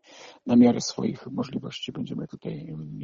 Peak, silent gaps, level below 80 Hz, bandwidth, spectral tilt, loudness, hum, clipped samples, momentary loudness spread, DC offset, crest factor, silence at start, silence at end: -8 dBFS; none; -62 dBFS; 7.6 kHz; -6 dB/octave; -26 LUFS; none; under 0.1%; 17 LU; under 0.1%; 18 dB; 0.1 s; 0 s